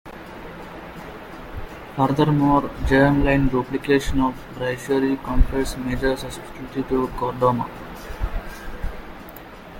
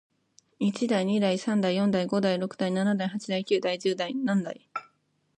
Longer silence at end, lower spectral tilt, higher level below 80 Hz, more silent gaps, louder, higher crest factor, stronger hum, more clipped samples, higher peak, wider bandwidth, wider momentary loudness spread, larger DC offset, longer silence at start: second, 0 s vs 0.6 s; about the same, -6.5 dB/octave vs -6 dB/octave; first, -30 dBFS vs -72 dBFS; neither; first, -22 LUFS vs -27 LUFS; first, 20 dB vs 14 dB; neither; neither; first, -2 dBFS vs -12 dBFS; first, 17 kHz vs 10 kHz; first, 19 LU vs 6 LU; neither; second, 0.05 s vs 0.6 s